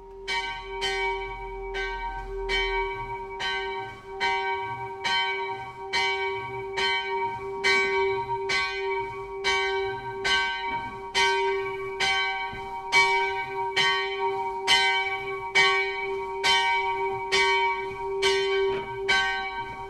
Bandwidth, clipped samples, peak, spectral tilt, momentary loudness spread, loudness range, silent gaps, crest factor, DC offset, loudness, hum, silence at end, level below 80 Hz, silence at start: 13.5 kHz; under 0.1%; -8 dBFS; -2 dB/octave; 12 LU; 6 LU; none; 20 dB; under 0.1%; -26 LUFS; none; 0 s; -48 dBFS; 0 s